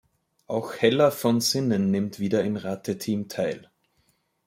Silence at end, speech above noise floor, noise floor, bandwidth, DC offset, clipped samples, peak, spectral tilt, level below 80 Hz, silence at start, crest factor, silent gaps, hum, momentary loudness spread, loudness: 0.9 s; 45 dB; -69 dBFS; 16.5 kHz; under 0.1%; under 0.1%; -6 dBFS; -5 dB/octave; -68 dBFS; 0.5 s; 20 dB; none; none; 10 LU; -25 LUFS